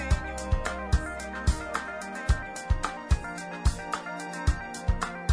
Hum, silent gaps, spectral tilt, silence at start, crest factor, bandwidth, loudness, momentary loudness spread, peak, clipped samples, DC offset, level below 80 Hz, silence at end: none; none; -5 dB/octave; 0 s; 16 dB; 11 kHz; -31 LUFS; 5 LU; -12 dBFS; under 0.1%; under 0.1%; -32 dBFS; 0 s